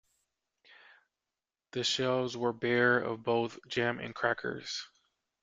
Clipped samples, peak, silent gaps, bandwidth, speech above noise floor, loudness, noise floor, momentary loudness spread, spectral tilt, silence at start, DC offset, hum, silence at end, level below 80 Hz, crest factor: under 0.1%; -14 dBFS; none; 9.4 kHz; over 58 dB; -32 LUFS; under -90 dBFS; 12 LU; -4 dB/octave; 1.75 s; under 0.1%; none; 0.55 s; -72 dBFS; 20 dB